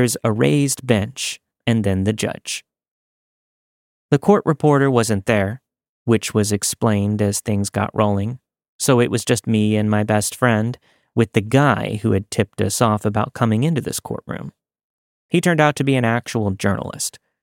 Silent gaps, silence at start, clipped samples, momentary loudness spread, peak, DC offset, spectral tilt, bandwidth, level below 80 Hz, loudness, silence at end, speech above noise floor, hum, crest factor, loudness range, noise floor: 2.91-4.09 s, 5.89-6.05 s, 8.69-8.79 s, 14.84-15.29 s; 0 s; under 0.1%; 11 LU; -2 dBFS; under 0.1%; -5.5 dB/octave; 17 kHz; -56 dBFS; -19 LUFS; 0.25 s; over 72 dB; none; 18 dB; 3 LU; under -90 dBFS